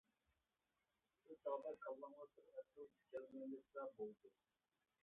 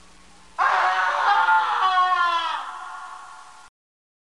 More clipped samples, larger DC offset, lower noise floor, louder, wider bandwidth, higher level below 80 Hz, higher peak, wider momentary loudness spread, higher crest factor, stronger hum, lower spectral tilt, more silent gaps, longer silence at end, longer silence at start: neither; second, under 0.1% vs 0.3%; first, under -90 dBFS vs -51 dBFS; second, -54 LUFS vs -20 LUFS; second, 3.7 kHz vs 11.5 kHz; second, under -90 dBFS vs -64 dBFS; second, -36 dBFS vs -8 dBFS; second, 13 LU vs 19 LU; about the same, 20 dB vs 16 dB; neither; first, -2 dB/octave vs 0 dB/octave; neither; about the same, 0.75 s vs 0.7 s; first, 1.25 s vs 0.6 s